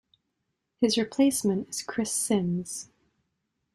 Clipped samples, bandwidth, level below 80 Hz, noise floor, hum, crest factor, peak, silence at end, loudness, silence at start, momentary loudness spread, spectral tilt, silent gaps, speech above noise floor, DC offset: under 0.1%; 15.5 kHz; -66 dBFS; -80 dBFS; none; 18 dB; -10 dBFS; 0.9 s; -27 LUFS; 0.8 s; 9 LU; -4 dB/octave; none; 54 dB; under 0.1%